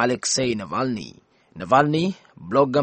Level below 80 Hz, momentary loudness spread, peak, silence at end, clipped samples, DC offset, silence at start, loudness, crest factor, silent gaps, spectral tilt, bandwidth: -58 dBFS; 18 LU; -2 dBFS; 0 s; under 0.1%; under 0.1%; 0 s; -22 LUFS; 20 dB; none; -4.5 dB/octave; 8.8 kHz